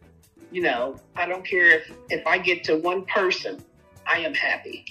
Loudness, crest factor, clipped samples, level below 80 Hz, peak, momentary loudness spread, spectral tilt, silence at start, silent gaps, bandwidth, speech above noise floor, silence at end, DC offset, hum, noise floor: -22 LUFS; 20 dB; under 0.1%; -62 dBFS; -4 dBFS; 14 LU; -4 dB/octave; 0.4 s; none; 13.5 kHz; 28 dB; 0 s; under 0.1%; none; -52 dBFS